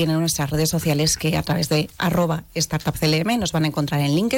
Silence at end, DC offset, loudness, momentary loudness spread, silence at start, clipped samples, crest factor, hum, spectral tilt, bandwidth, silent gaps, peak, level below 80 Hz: 0 s; under 0.1%; -21 LUFS; 3 LU; 0 s; under 0.1%; 10 dB; none; -4.5 dB/octave; 17 kHz; none; -12 dBFS; -44 dBFS